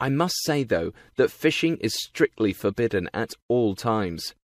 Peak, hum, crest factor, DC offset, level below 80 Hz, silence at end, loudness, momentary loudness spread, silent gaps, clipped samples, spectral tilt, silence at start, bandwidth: -6 dBFS; none; 18 dB; under 0.1%; -56 dBFS; 0.15 s; -25 LUFS; 5 LU; 3.42-3.49 s; under 0.1%; -5 dB/octave; 0 s; 15.5 kHz